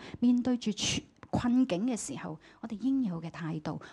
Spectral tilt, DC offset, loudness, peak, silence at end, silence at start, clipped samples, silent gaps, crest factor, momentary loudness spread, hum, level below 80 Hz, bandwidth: -4.5 dB/octave; under 0.1%; -31 LUFS; -18 dBFS; 0 s; 0 s; under 0.1%; none; 14 dB; 12 LU; none; -58 dBFS; 11.5 kHz